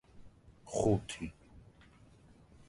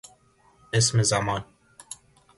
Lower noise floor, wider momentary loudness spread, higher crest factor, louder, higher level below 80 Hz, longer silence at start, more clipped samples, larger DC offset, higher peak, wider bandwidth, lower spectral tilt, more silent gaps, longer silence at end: about the same, -61 dBFS vs -60 dBFS; second, 16 LU vs 22 LU; about the same, 22 dB vs 18 dB; second, -35 LUFS vs -24 LUFS; about the same, -56 dBFS vs -54 dBFS; second, 0.15 s vs 0.75 s; neither; neither; second, -18 dBFS vs -10 dBFS; about the same, 11.5 kHz vs 11.5 kHz; first, -6 dB/octave vs -3.5 dB/octave; neither; first, 1.1 s vs 0.45 s